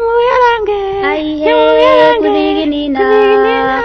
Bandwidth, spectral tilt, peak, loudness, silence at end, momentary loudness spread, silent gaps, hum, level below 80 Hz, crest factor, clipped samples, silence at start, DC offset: 6.4 kHz; -5.5 dB/octave; 0 dBFS; -10 LUFS; 0 s; 7 LU; none; none; -38 dBFS; 10 dB; 0.3%; 0 s; under 0.1%